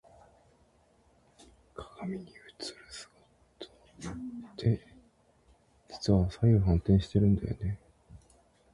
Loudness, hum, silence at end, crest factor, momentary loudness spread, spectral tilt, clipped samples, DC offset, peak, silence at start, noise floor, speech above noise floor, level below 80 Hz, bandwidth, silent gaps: -30 LUFS; none; 0.6 s; 20 dB; 24 LU; -8 dB/octave; under 0.1%; under 0.1%; -12 dBFS; 1.8 s; -66 dBFS; 39 dB; -44 dBFS; 11 kHz; none